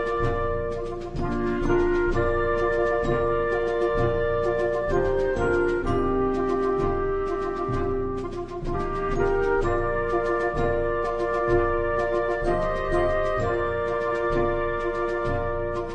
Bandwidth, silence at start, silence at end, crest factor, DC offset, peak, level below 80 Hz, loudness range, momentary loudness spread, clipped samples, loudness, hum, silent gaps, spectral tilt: 9.2 kHz; 0 s; 0 s; 14 dB; under 0.1%; -10 dBFS; -34 dBFS; 2 LU; 5 LU; under 0.1%; -25 LUFS; none; none; -7.5 dB/octave